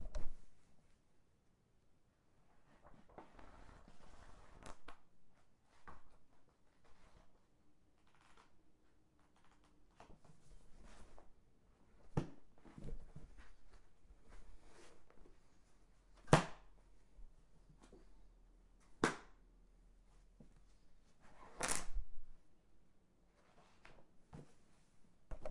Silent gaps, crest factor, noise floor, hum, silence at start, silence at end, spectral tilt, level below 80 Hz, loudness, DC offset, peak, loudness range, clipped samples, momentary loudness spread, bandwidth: none; 34 dB; -74 dBFS; none; 0 s; 0 s; -4.5 dB/octave; -58 dBFS; -42 LUFS; under 0.1%; -12 dBFS; 24 LU; under 0.1%; 26 LU; 11 kHz